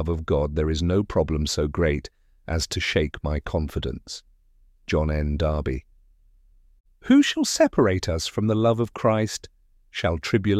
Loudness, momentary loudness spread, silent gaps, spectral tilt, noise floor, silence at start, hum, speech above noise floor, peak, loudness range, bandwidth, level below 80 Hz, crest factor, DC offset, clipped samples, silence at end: -24 LUFS; 15 LU; 6.80-6.84 s; -5.5 dB/octave; -57 dBFS; 0 s; none; 34 dB; -6 dBFS; 6 LU; 15 kHz; -34 dBFS; 18 dB; under 0.1%; under 0.1%; 0 s